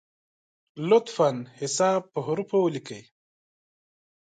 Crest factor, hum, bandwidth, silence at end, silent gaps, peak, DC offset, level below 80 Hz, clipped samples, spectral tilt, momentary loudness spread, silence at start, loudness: 18 dB; none; 9.4 kHz; 1.25 s; none; -8 dBFS; under 0.1%; -78 dBFS; under 0.1%; -5 dB/octave; 13 LU; 0.75 s; -25 LUFS